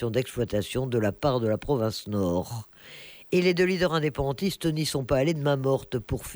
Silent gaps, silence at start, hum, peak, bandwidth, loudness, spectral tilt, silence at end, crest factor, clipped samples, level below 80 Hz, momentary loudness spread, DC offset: none; 0 s; none; -12 dBFS; over 20 kHz; -27 LUFS; -6 dB/octave; 0 s; 16 dB; under 0.1%; -48 dBFS; 9 LU; under 0.1%